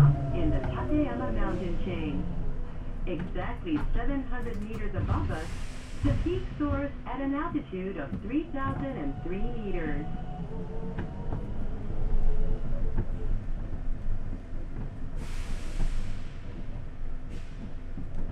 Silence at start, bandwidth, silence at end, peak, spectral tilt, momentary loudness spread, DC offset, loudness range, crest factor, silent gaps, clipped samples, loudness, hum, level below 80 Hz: 0 s; 6 kHz; 0 s; -10 dBFS; -8 dB/octave; 12 LU; under 0.1%; 7 LU; 18 dB; none; under 0.1%; -34 LUFS; none; -32 dBFS